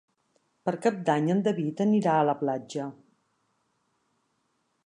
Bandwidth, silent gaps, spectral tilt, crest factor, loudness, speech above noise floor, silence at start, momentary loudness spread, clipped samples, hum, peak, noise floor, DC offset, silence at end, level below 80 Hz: 10.5 kHz; none; -7 dB/octave; 18 dB; -27 LUFS; 49 dB; 0.65 s; 12 LU; under 0.1%; none; -10 dBFS; -75 dBFS; under 0.1%; 1.9 s; -78 dBFS